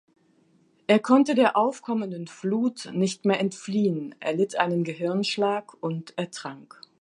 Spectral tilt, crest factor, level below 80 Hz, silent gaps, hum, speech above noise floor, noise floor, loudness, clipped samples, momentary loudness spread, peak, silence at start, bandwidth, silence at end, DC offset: -5.5 dB/octave; 20 dB; -78 dBFS; none; none; 38 dB; -63 dBFS; -25 LUFS; under 0.1%; 13 LU; -4 dBFS; 0.9 s; 11 kHz; 0.35 s; under 0.1%